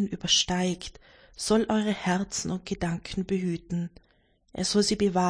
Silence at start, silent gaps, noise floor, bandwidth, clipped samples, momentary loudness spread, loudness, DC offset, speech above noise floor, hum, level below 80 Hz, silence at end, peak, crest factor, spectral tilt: 0 s; none; -65 dBFS; 10.5 kHz; under 0.1%; 11 LU; -27 LUFS; under 0.1%; 38 dB; none; -52 dBFS; 0 s; -10 dBFS; 18 dB; -4 dB/octave